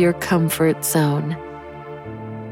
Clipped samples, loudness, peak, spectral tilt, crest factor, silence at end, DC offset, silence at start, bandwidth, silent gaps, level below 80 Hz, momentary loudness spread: under 0.1%; -19 LUFS; -6 dBFS; -5.5 dB/octave; 16 dB; 0 s; under 0.1%; 0 s; 17.5 kHz; none; -50 dBFS; 17 LU